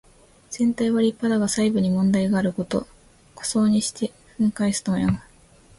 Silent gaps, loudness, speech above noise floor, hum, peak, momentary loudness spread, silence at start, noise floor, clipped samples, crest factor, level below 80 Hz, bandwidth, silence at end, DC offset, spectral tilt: none; -23 LUFS; 31 dB; none; -10 dBFS; 9 LU; 0.5 s; -52 dBFS; under 0.1%; 14 dB; -50 dBFS; 11.5 kHz; 0.55 s; under 0.1%; -5.5 dB/octave